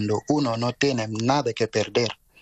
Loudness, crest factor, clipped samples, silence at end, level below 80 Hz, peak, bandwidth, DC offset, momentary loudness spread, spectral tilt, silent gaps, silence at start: -24 LUFS; 18 dB; under 0.1%; 0.25 s; -58 dBFS; -6 dBFS; 8.6 kHz; under 0.1%; 2 LU; -5 dB/octave; none; 0 s